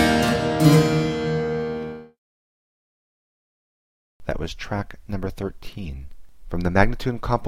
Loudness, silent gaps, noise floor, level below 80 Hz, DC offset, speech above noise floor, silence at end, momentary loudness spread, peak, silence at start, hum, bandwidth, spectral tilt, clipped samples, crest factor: -23 LUFS; 2.18-4.20 s; under -90 dBFS; -36 dBFS; under 0.1%; over 66 dB; 0 s; 18 LU; -2 dBFS; 0 s; none; 16.5 kHz; -6 dB/octave; under 0.1%; 22 dB